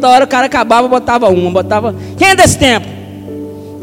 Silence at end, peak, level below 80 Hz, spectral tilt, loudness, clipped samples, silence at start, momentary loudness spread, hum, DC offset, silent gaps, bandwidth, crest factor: 0 s; 0 dBFS; -36 dBFS; -4 dB/octave; -9 LUFS; 1%; 0 s; 19 LU; none; under 0.1%; none; 17 kHz; 10 dB